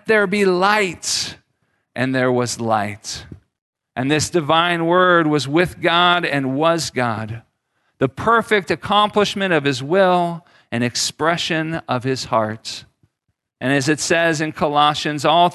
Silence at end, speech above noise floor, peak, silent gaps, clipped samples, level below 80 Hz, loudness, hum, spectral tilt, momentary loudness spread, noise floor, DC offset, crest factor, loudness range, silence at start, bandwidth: 0 s; 56 dB; -2 dBFS; 3.62-3.73 s; under 0.1%; -52 dBFS; -18 LUFS; none; -4 dB/octave; 12 LU; -74 dBFS; under 0.1%; 18 dB; 5 LU; 0.05 s; 12.5 kHz